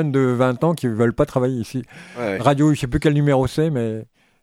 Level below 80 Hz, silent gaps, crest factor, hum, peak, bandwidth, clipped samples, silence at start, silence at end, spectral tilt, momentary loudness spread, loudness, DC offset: -42 dBFS; none; 18 dB; none; 0 dBFS; 14.5 kHz; under 0.1%; 0 s; 0.4 s; -7.5 dB/octave; 11 LU; -19 LUFS; under 0.1%